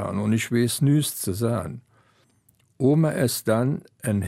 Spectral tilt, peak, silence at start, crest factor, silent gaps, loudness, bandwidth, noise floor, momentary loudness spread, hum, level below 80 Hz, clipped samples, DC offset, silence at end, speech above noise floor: -6 dB/octave; -8 dBFS; 0 s; 16 dB; none; -23 LUFS; 16 kHz; -63 dBFS; 9 LU; none; -58 dBFS; under 0.1%; under 0.1%; 0 s; 40 dB